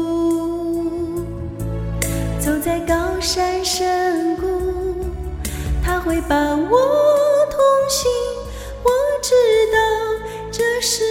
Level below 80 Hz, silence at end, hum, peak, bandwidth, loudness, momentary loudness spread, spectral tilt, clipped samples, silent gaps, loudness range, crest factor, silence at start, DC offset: -32 dBFS; 0 s; none; -2 dBFS; 17 kHz; -19 LUFS; 11 LU; -4 dB/octave; under 0.1%; none; 5 LU; 16 dB; 0 s; under 0.1%